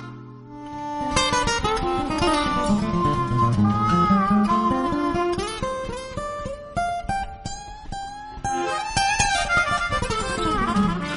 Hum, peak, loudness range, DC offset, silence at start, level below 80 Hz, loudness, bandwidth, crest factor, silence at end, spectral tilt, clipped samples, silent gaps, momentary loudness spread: none; -4 dBFS; 8 LU; under 0.1%; 0 s; -36 dBFS; -22 LUFS; 10.5 kHz; 20 dB; 0 s; -4.5 dB/octave; under 0.1%; none; 15 LU